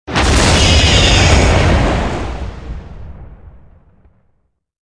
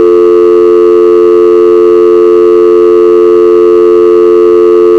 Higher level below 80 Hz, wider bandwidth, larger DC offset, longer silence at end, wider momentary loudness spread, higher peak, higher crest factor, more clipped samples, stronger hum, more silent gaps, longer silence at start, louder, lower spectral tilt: first, -18 dBFS vs -44 dBFS; first, 11 kHz vs 6.2 kHz; neither; first, 1.35 s vs 0 s; first, 19 LU vs 0 LU; about the same, 0 dBFS vs 0 dBFS; first, 14 dB vs 4 dB; second, under 0.1% vs 10%; neither; neither; about the same, 0.05 s vs 0 s; second, -11 LUFS vs -4 LUFS; second, -4 dB/octave vs -7 dB/octave